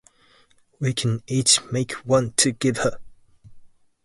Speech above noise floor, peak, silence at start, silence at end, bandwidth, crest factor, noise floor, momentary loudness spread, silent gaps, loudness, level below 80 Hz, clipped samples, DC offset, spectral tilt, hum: 36 dB; -2 dBFS; 0.8 s; 0.4 s; 11.5 kHz; 22 dB; -58 dBFS; 10 LU; none; -21 LUFS; -54 dBFS; under 0.1%; under 0.1%; -3.5 dB/octave; none